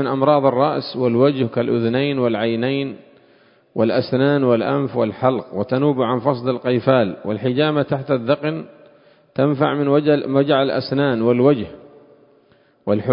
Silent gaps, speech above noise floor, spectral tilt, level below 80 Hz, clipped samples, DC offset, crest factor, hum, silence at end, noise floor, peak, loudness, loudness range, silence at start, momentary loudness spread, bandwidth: none; 38 dB; -12 dB/octave; -58 dBFS; under 0.1%; under 0.1%; 18 dB; none; 0 s; -55 dBFS; 0 dBFS; -18 LUFS; 2 LU; 0 s; 7 LU; 5.4 kHz